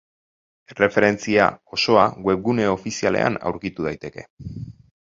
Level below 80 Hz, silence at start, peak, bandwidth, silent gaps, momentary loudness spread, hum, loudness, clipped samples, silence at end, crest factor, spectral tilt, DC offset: -52 dBFS; 0.7 s; 0 dBFS; 7.8 kHz; 4.30-4.37 s; 19 LU; none; -20 LUFS; under 0.1%; 0.3 s; 22 dB; -5 dB/octave; under 0.1%